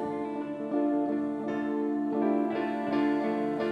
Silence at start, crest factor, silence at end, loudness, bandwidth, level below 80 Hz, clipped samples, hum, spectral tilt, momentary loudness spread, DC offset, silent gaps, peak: 0 s; 12 dB; 0 s; -30 LUFS; 5.4 kHz; -72 dBFS; under 0.1%; none; -7.5 dB/octave; 5 LU; under 0.1%; none; -16 dBFS